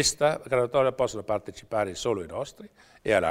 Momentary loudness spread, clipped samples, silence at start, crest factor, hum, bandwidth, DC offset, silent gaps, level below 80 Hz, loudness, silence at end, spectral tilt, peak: 12 LU; under 0.1%; 0 s; 20 dB; none; 16 kHz; under 0.1%; none; -54 dBFS; -27 LUFS; 0 s; -3.5 dB/octave; -8 dBFS